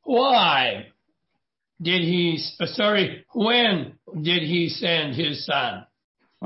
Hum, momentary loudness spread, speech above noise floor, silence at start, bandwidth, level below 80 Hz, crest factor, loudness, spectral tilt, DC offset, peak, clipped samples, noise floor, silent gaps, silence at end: none; 11 LU; 57 dB; 0.05 s; 6 kHz; -68 dBFS; 16 dB; -22 LUFS; -8 dB/octave; under 0.1%; -6 dBFS; under 0.1%; -79 dBFS; 6.04-6.15 s; 0 s